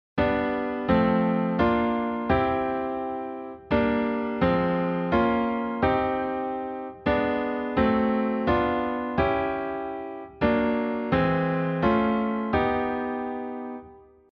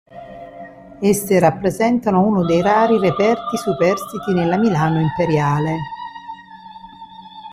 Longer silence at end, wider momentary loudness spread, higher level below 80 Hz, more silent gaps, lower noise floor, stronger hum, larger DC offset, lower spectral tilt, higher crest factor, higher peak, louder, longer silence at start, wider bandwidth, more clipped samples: first, 0.3 s vs 0 s; second, 9 LU vs 23 LU; about the same, -46 dBFS vs -50 dBFS; neither; first, -49 dBFS vs -39 dBFS; neither; neither; first, -9 dB/octave vs -6.5 dB/octave; about the same, 16 dB vs 16 dB; second, -8 dBFS vs -2 dBFS; second, -25 LUFS vs -17 LUFS; about the same, 0.15 s vs 0.15 s; second, 5.6 kHz vs 16 kHz; neither